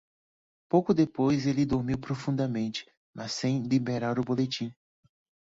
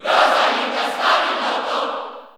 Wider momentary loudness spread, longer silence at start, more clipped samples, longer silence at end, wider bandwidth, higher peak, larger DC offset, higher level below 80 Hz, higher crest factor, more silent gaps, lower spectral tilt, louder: about the same, 10 LU vs 8 LU; first, 0.75 s vs 0 s; neither; first, 0.7 s vs 0.1 s; second, 8 kHz vs over 20 kHz; second, -10 dBFS vs -2 dBFS; neither; first, -58 dBFS vs -74 dBFS; about the same, 20 dB vs 18 dB; first, 2.97-3.13 s vs none; first, -6.5 dB/octave vs -1 dB/octave; second, -28 LUFS vs -18 LUFS